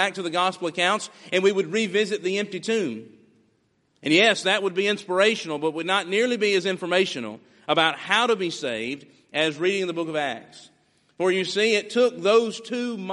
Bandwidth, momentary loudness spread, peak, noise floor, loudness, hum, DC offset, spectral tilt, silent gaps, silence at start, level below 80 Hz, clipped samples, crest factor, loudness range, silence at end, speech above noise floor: 11.5 kHz; 9 LU; -4 dBFS; -67 dBFS; -23 LUFS; none; under 0.1%; -3.5 dB/octave; none; 0 s; -74 dBFS; under 0.1%; 20 dB; 4 LU; 0 s; 44 dB